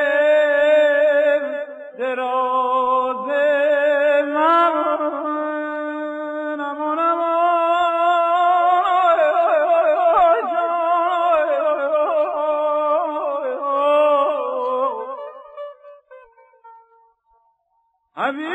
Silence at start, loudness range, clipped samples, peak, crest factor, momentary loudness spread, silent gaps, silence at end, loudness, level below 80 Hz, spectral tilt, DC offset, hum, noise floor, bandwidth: 0 s; 6 LU; under 0.1%; -6 dBFS; 12 dB; 11 LU; none; 0 s; -18 LUFS; -64 dBFS; -4 dB/octave; under 0.1%; none; -67 dBFS; 8.2 kHz